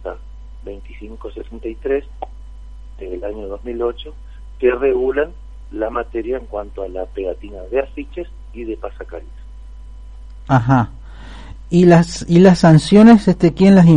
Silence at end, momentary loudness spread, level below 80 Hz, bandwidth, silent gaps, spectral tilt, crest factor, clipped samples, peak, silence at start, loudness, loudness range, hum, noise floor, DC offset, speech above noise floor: 0 s; 25 LU; -34 dBFS; 10.5 kHz; none; -7.5 dB/octave; 16 dB; under 0.1%; 0 dBFS; 0 s; -15 LUFS; 16 LU; none; -34 dBFS; 0.5%; 20 dB